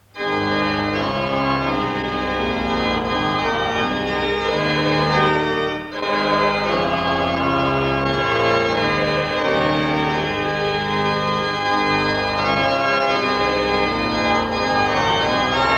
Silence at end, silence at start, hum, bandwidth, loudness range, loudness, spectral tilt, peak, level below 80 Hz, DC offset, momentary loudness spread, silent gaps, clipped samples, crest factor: 0 s; 0.15 s; none; 18.5 kHz; 2 LU; -19 LUFS; -5.5 dB/octave; -4 dBFS; -40 dBFS; under 0.1%; 3 LU; none; under 0.1%; 16 dB